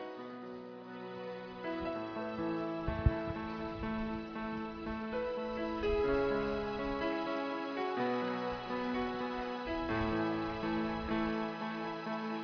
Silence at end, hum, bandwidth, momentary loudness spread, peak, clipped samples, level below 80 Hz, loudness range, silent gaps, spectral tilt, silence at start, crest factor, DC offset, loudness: 0 s; none; 5.4 kHz; 10 LU; -16 dBFS; under 0.1%; -48 dBFS; 3 LU; none; -5 dB/octave; 0 s; 22 dB; under 0.1%; -37 LUFS